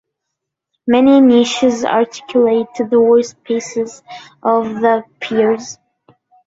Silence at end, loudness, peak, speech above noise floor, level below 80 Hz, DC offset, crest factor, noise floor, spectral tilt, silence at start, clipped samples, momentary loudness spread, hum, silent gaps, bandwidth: 0.75 s; -14 LUFS; -2 dBFS; 64 dB; -58 dBFS; under 0.1%; 14 dB; -78 dBFS; -4.5 dB/octave; 0.85 s; under 0.1%; 13 LU; none; none; 7.8 kHz